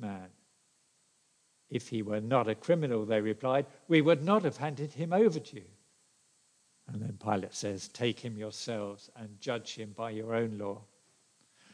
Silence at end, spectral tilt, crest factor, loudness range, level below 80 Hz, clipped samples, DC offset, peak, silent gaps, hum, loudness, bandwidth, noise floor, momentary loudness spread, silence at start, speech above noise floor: 0.9 s; -6 dB/octave; 22 dB; 9 LU; -82 dBFS; under 0.1%; under 0.1%; -12 dBFS; none; none; -32 LUFS; 10.5 kHz; -71 dBFS; 15 LU; 0 s; 39 dB